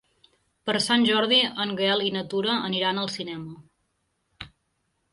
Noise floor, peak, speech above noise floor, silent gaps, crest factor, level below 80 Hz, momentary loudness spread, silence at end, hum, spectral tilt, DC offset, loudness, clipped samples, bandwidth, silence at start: -74 dBFS; -8 dBFS; 50 dB; none; 18 dB; -64 dBFS; 23 LU; 0.65 s; none; -4 dB/octave; under 0.1%; -24 LUFS; under 0.1%; 11.5 kHz; 0.65 s